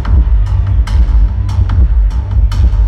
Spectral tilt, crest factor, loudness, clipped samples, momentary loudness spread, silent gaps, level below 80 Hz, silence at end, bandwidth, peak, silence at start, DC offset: -8 dB/octave; 8 dB; -13 LUFS; under 0.1%; 2 LU; none; -10 dBFS; 0 s; 6 kHz; -2 dBFS; 0 s; under 0.1%